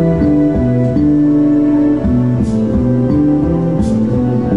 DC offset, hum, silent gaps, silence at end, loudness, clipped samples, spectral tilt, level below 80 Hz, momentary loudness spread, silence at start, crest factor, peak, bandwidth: 1%; none; none; 0 s; -13 LUFS; under 0.1%; -10 dB/octave; -28 dBFS; 3 LU; 0 s; 8 dB; -2 dBFS; 7.8 kHz